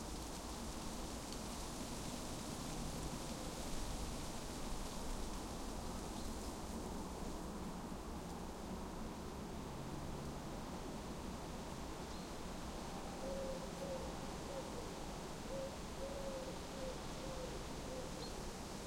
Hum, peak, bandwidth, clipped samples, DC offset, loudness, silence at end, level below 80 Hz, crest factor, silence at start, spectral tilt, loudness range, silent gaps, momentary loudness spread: none; -30 dBFS; 16.5 kHz; under 0.1%; under 0.1%; -47 LUFS; 0 s; -52 dBFS; 16 dB; 0 s; -4.5 dB/octave; 2 LU; none; 3 LU